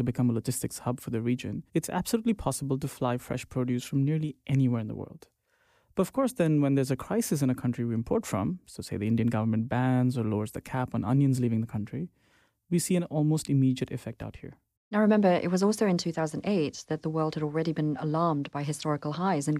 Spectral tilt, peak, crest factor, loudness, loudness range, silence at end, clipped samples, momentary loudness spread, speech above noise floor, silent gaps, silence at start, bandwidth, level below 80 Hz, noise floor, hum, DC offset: -6.5 dB/octave; -12 dBFS; 16 dB; -29 LUFS; 3 LU; 0 s; under 0.1%; 9 LU; 41 dB; 14.77-14.91 s; 0 s; 15.5 kHz; -58 dBFS; -68 dBFS; none; under 0.1%